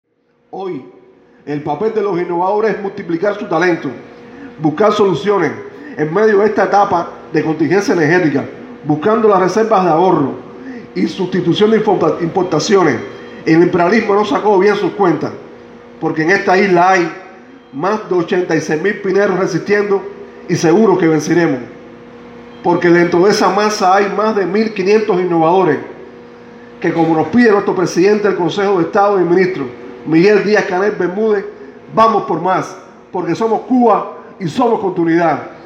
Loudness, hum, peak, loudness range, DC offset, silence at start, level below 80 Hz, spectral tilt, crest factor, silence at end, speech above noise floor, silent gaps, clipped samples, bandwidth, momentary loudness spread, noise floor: -13 LUFS; none; 0 dBFS; 3 LU; under 0.1%; 0.55 s; -58 dBFS; -6 dB/octave; 14 dB; 0 s; 30 dB; none; under 0.1%; 10.5 kHz; 14 LU; -42 dBFS